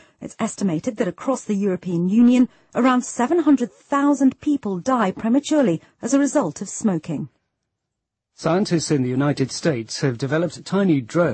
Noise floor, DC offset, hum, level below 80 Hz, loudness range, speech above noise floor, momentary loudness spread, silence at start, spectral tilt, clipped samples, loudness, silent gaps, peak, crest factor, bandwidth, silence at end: -81 dBFS; under 0.1%; none; -62 dBFS; 5 LU; 61 dB; 8 LU; 0.2 s; -6 dB/octave; under 0.1%; -21 LUFS; none; -6 dBFS; 14 dB; 8.8 kHz; 0 s